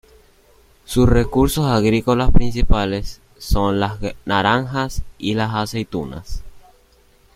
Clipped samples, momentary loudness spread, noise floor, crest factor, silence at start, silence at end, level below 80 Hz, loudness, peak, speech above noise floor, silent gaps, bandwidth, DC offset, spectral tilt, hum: under 0.1%; 13 LU; -53 dBFS; 18 dB; 0.9 s; 0.75 s; -26 dBFS; -19 LUFS; 0 dBFS; 37 dB; none; 15 kHz; under 0.1%; -6 dB/octave; none